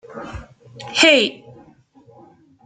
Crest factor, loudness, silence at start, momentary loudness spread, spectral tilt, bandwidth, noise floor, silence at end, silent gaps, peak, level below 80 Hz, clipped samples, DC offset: 22 dB; -14 LUFS; 0.15 s; 25 LU; -2 dB/octave; 9.4 kHz; -50 dBFS; 1.3 s; none; 0 dBFS; -50 dBFS; under 0.1%; under 0.1%